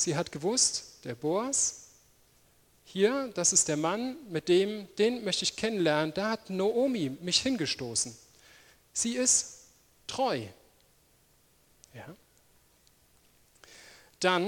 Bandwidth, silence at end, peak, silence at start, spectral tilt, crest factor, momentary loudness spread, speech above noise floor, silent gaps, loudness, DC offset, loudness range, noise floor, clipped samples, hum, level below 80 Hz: 18 kHz; 0 s; -8 dBFS; 0 s; -2.5 dB/octave; 22 dB; 16 LU; 36 dB; none; -29 LUFS; under 0.1%; 10 LU; -65 dBFS; under 0.1%; none; -66 dBFS